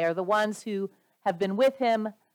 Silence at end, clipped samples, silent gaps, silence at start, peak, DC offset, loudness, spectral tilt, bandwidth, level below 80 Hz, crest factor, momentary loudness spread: 0.2 s; under 0.1%; none; 0 s; -12 dBFS; under 0.1%; -27 LUFS; -5.5 dB/octave; 18.5 kHz; -82 dBFS; 16 dB; 9 LU